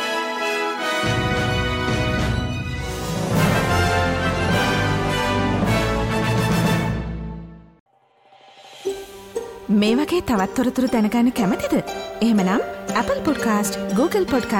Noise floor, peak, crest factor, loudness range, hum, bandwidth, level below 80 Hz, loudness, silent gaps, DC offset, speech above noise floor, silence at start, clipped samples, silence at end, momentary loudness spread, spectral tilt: -55 dBFS; -8 dBFS; 14 dB; 5 LU; none; 17 kHz; -36 dBFS; -21 LUFS; 7.80-7.86 s; under 0.1%; 35 dB; 0 s; under 0.1%; 0 s; 11 LU; -5.5 dB/octave